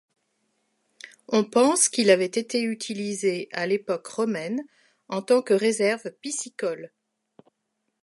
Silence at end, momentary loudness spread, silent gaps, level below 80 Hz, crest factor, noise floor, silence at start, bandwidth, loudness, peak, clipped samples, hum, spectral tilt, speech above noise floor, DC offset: 1.15 s; 12 LU; none; -80 dBFS; 22 dB; -78 dBFS; 1.05 s; 11.5 kHz; -24 LUFS; -4 dBFS; under 0.1%; none; -3 dB/octave; 54 dB; under 0.1%